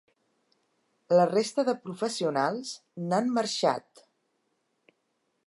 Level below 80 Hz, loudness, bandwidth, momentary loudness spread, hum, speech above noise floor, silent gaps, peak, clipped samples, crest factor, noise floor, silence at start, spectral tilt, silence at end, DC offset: -84 dBFS; -28 LUFS; 11.5 kHz; 13 LU; none; 49 dB; none; -10 dBFS; under 0.1%; 20 dB; -77 dBFS; 1.1 s; -4.5 dB/octave; 1.65 s; under 0.1%